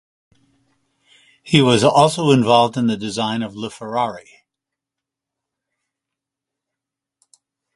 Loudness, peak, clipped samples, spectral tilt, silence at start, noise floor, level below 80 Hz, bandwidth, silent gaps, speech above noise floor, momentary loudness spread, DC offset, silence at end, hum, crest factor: -17 LUFS; 0 dBFS; under 0.1%; -5.5 dB/octave; 1.45 s; -85 dBFS; -58 dBFS; 11.5 kHz; none; 68 dB; 12 LU; under 0.1%; 3.55 s; none; 20 dB